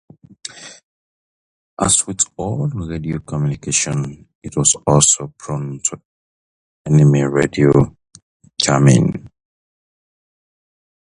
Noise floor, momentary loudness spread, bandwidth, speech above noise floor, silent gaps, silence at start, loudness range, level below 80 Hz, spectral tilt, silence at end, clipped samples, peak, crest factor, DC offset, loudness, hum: under -90 dBFS; 20 LU; 11.5 kHz; over 74 dB; 0.83-1.77 s, 4.35-4.42 s, 6.05-6.85 s, 8.22-8.40 s; 0.55 s; 4 LU; -44 dBFS; -4.5 dB/octave; 1.9 s; under 0.1%; 0 dBFS; 18 dB; under 0.1%; -16 LUFS; none